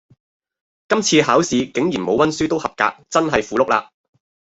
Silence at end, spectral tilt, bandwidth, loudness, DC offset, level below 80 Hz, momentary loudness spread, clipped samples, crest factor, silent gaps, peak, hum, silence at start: 0.7 s; -4 dB/octave; 8.4 kHz; -18 LUFS; under 0.1%; -52 dBFS; 6 LU; under 0.1%; 18 dB; none; -2 dBFS; none; 0.9 s